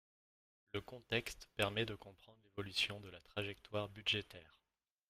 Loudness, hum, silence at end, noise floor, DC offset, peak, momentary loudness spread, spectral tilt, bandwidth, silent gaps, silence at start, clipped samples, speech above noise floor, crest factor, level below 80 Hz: -41 LUFS; none; 0.65 s; under -90 dBFS; under 0.1%; -20 dBFS; 15 LU; -4 dB/octave; 15.5 kHz; none; 0.75 s; under 0.1%; over 47 dB; 24 dB; -68 dBFS